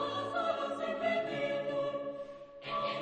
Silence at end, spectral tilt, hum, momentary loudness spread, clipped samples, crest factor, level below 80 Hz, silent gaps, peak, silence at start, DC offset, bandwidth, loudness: 0 s; -5 dB/octave; none; 10 LU; under 0.1%; 14 dB; -74 dBFS; none; -20 dBFS; 0 s; under 0.1%; 9.4 kHz; -35 LUFS